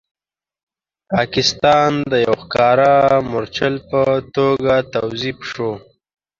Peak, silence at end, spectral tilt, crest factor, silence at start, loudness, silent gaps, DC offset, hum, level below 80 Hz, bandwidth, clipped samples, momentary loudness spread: 0 dBFS; 0.6 s; -5 dB/octave; 16 dB; 1.1 s; -16 LUFS; none; under 0.1%; none; -48 dBFS; 7.6 kHz; under 0.1%; 11 LU